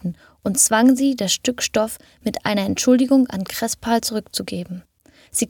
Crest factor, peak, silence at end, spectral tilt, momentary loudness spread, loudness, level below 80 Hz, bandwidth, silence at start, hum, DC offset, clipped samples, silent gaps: 18 dB; -2 dBFS; 0 s; -3.5 dB/octave; 14 LU; -19 LUFS; -54 dBFS; 18.5 kHz; 0.05 s; none; under 0.1%; under 0.1%; none